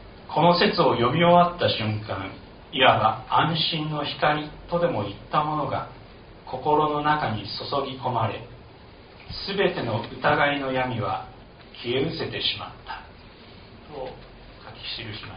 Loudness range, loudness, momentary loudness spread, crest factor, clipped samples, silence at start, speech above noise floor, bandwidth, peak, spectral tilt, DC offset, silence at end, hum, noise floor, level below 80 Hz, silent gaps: 9 LU; -24 LUFS; 19 LU; 22 dB; under 0.1%; 0 s; 23 dB; 5.4 kHz; -4 dBFS; -3 dB/octave; under 0.1%; 0 s; none; -47 dBFS; -50 dBFS; none